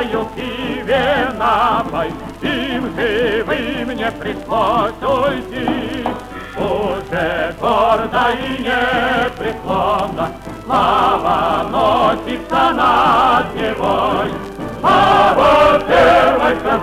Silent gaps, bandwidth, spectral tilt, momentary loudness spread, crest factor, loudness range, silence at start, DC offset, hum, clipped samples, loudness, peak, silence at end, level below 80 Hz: none; 16 kHz; -5.5 dB/octave; 12 LU; 14 dB; 6 LU; 0 s; under 0.1%; none; under 0.1%; -15 LUFS; -2 dBFS; 0 s; -36 dBFS